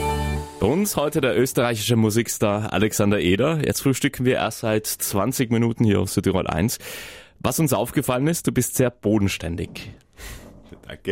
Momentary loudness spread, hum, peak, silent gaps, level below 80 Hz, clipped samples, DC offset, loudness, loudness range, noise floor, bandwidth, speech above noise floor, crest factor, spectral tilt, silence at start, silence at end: 14 LU; none; -6 dBFS; none; -42 dBFS; under 0.1%; under 0.1%; -22 LUFS; 2 LU; -44 dBFS; 16.5 kHz; 23 dB; 16 dB; -5 dB/octave; 0 s; 0 s